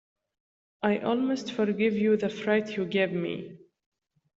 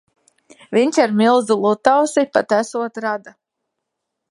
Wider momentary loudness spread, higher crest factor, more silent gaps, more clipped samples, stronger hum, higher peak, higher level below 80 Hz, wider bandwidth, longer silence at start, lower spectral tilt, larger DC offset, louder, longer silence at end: about the same, 7 LU vs 9 LU; about the same, 18 dB vs 18 dB; neither; neither; neither; second, -10 dBFS vs 0 dBFS; about the same, -70 dBFS vs -68 dBFS; second, 7.8 kHz vs 11.5 kHz; about the same, 0.8 s vs 0.7 s; first, -6.5 dB/octave vs -4.5 dB/octave; neither; second, -28 LUFS vs -17 LUFS; second, 0.85 s vs 1 s